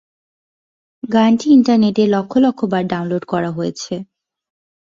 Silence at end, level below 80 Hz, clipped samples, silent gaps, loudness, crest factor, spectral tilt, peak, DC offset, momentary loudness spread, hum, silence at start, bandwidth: 0.8 s; -58 dBFS; under 0.1%; none; -15 LUFS; 14 dB; -6.5 dB/octave; -2 dBFS; under 0.1%; 14 LU; none; 1.05 s; 7.6 kHz